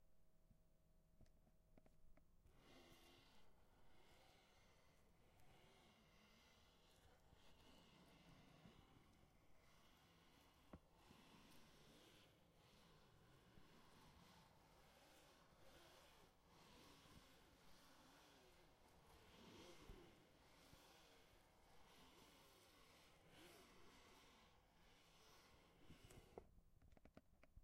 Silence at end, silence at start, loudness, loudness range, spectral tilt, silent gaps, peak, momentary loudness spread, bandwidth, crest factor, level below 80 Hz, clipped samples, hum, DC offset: 0 s; 0 s; -68 LUFS; 1 LU; -4 dB/octave; none; -42 dBFS; 5 LU; 15.5 kHz; 28 dB; -78 dBFS; under 0.1%; none; under 0.1%